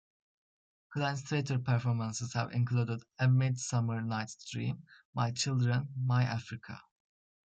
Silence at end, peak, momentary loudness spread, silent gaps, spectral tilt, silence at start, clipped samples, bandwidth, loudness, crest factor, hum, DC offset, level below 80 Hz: 0.65 s; -18 dBFS; 12 LU; 5.05-5.13 s; -5.5 dB/octave; 0.9 s; under 0.1%; 8.8 kHz; -33 LUFS; 16 dB; none; under 0.1%; -70 dBFS